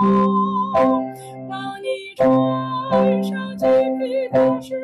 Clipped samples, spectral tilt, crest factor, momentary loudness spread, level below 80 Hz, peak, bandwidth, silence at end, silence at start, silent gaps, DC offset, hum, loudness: under 0.1%; -8 dB/octave; 10 dB; 12 LU; -58 dBFS; -8 dBFS; 12.5 kHz; 0 s; 0 s; none; under 0.1%; none; -19 LUFS